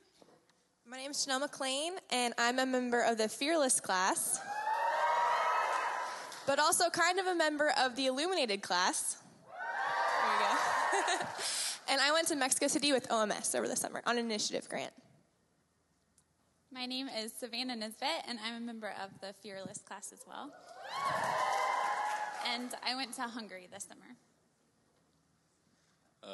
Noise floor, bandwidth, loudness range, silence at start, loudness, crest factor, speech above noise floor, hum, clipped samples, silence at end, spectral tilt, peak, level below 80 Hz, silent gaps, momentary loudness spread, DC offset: -75 dBFS; 12.5 kHz; 10 LU; 0.85 s; -33 LUFS; 22 dB; 41 dB; none; under 0.1%; 0 s; -1 dB/octave; -12 dBFS; -88 dBFS; none; 16 LU; under 0.1%